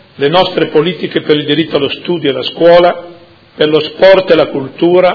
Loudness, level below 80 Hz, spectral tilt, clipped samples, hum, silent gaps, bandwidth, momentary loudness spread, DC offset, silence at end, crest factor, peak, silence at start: -10 LUFS; -46 dBFS; -7.5 dB/octave; 1%; none; none; 5.4 kHz; 8 LU; under 0.1%; 0 s; 10 dB; 0 dBFS; 0.2 s